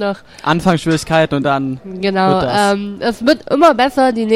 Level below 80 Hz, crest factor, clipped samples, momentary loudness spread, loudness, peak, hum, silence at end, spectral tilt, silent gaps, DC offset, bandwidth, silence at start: -44 dBFS; 14 dB; under 0.1%; 9 LU; -14 LUFS; 0 dBFS; none; 0 s; -5.5 dB/octave; none; under 0.1%; 16 kHz; 0 s